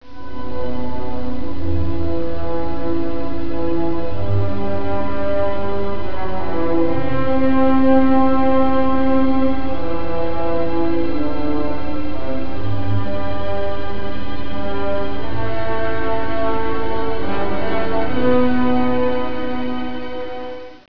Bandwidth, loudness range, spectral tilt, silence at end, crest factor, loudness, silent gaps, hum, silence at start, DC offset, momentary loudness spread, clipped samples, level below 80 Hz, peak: 5.4 kHz; 7 LU; -9 dB/octave; 0 s; 14 dB; -21 LUFS; none; none; 0 s; 20%; 10 LU; under 0.1%; -36 dBFS; -2 dBFS